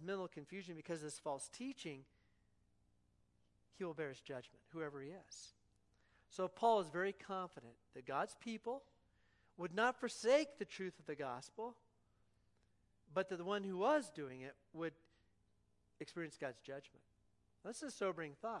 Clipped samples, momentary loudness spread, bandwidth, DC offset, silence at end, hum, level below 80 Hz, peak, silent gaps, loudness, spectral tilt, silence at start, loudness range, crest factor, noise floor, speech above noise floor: under 0.1%; 18 LU; 11.5 kHz; under 0.1%; 0 s; 60 Hz at -80 dBFS; -82 dBFS; -22 dBFS; none; -44 LUFS; -4.5 dB/octave; 0 s; 10 LU; 22 dB; -77 dBFS; 34 dB